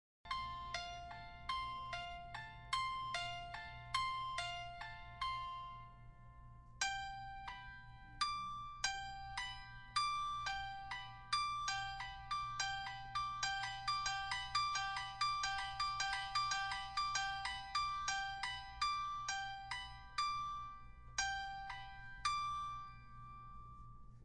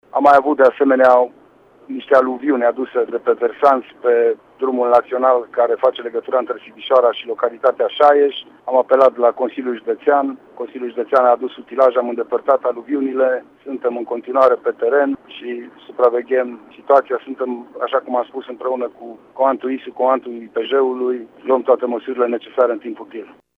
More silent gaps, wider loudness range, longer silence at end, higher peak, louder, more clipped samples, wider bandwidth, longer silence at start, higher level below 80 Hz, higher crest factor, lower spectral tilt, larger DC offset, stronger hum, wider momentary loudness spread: neither; about the same, 6 LU vs 4 LU; second, 0 s vs 0.3 s; second, -22 dBFS vs -2 dBFS; second, -42 LUFS vs -17 LUFS; neither; first, 11.5 kHz vs 5.8 kHz; about the same, 0.25 s vs 0.15 s; first, -60 dBFS vs -68 dBFS; about the same, 20 dB vs 16 dB; second, -0.5 dB/octave vs -5.5 dB/octave; neither; neither; about the same, 14 LU vs 14 LU